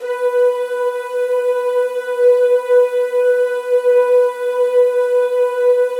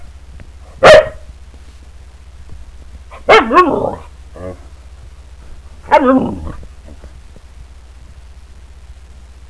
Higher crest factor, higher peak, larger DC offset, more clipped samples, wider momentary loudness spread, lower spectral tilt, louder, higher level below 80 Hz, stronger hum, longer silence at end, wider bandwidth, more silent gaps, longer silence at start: second, 10 dB vs 16 dB; second, -4 dBFS vs 0 dBFS; second, under 0.1% vs 0.6%; second, under 0.1% vs 0.7%; second, 6 LU vs 25 LU; second, 0 dB/octave vs -5 dB/octave; second, -15 LUFS vs -10 LUFS; second, under -90 dBFS vs -34 dBFS; neither; second, 0 s vs 0.55 s; about the same, 12 kHz vs 11 kHz; neither; about the same, 0 s vs 0 s